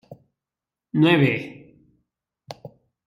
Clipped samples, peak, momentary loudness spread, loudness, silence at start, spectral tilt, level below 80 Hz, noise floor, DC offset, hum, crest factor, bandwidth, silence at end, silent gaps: under 0.1%; -6 dBFS; 24 LU; -20 LUFS; 0.1 s; -7.5 dB/octave; -66 dBFS; -89 dBFS; under 0.1%; none; 20 dB; 12 kHz; 0.4 s; none